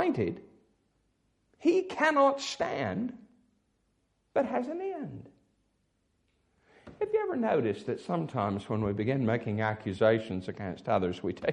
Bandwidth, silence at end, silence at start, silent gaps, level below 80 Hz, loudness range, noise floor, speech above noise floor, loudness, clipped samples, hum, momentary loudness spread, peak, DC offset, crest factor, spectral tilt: 11 kHz; 0 s; 0 s; none; -66 dBFS; 8 LU; -75 dBFS; 45 dB; -30 LUFS; under 0.1%; none; 11 LU; -12 dBFS; under 0.1%; 20 dB; -6.5 dB/octave